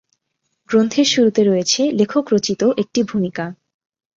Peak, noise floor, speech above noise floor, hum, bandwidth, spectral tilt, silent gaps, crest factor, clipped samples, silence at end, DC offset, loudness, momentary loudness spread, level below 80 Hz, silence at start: -2 dBFS; -73 dBFS; 56 dB; none; 7.6 kHz; -4.5 dB/octave; none; 16 dB; under 0.1%; 0.65 s; under 0.1%; -17 LUFS; 8 LU; -60 dBFS; 0.7 s